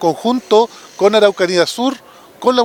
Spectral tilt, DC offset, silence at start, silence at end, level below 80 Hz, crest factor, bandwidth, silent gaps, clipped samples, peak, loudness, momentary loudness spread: -4 dB/octave; under 0.1%; 0 s; 0 s; -60 dBFS; 14 dB; 18 kHz; none; under 0.1%; 0 dBFS; -14 LUFS; 9 LU